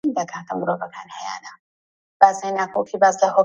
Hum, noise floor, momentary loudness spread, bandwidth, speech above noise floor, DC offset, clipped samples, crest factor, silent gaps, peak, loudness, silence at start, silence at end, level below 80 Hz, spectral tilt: none; under -90 dBFS; 16 LU; 8 kHz; over 70 dB; under 0.1%; under 0.1%; 20 dB; 1.59-2.20 s; 0 dBFS; -20 LUFS; 0.05 s; 0 s; -70 dBFS; -4.5 dB/octave